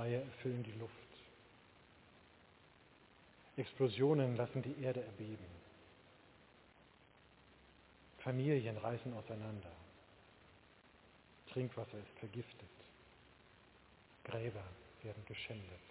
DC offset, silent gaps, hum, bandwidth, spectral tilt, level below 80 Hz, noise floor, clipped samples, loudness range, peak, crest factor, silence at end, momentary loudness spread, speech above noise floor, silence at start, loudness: under 0.1%; none; none; 4 kHz; -6.5 dB/octave; -72 dBFS; -67 dBFS; under 0.1%; 11 LU; -22 dBFS; 22 dB; 0 s; 28 LU; 26 dB; 0 s; -43 LUFS